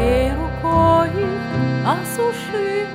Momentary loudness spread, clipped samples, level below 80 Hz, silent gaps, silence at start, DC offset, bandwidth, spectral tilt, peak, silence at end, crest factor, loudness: 7 LU; under 0.1%; -32 dBFS; none; 0 s; under 0.1%; 16 kHz; -6.5 dB/octave; -4 dBFS; 0 s; 14 dB; -19 LUFS